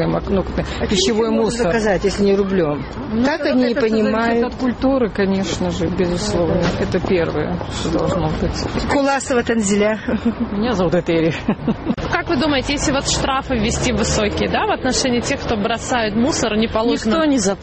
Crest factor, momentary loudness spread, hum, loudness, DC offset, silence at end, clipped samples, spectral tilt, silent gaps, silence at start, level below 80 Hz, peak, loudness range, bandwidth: 14 dB; 4 LU; none; -18 LUFS; under 0.1%; 0 s; under 0.1%; -5 dB/octave; none; 0 s; -32 dBFS; -2 dBFS; 2 LU; 8.8 kHz